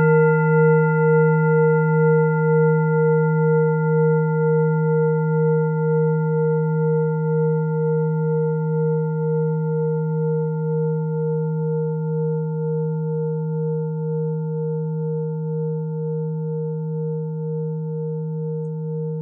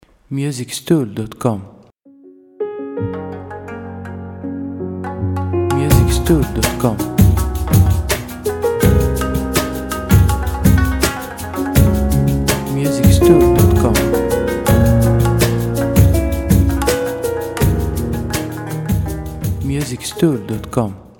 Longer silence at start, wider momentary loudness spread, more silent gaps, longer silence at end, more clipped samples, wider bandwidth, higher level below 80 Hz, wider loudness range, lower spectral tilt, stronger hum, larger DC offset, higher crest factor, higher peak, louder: second, 0 s vs 0.3 s; second, 9 LU vs 13 LU; neither; second, 0 s vs 0.15 s; neither; second, 2.8 kHz vs 19 kHz; second, -78 dBFS vs -24 dBFS; about the same, 8 LU vs 10 LU; first, -16 dB/octave vs -6 dB/octave; neither; neither; about the same, 14 dB vs 16 dB; second, -6 dBFS vs 0 dBFS; second, -20 LUFS vs -16 LUFS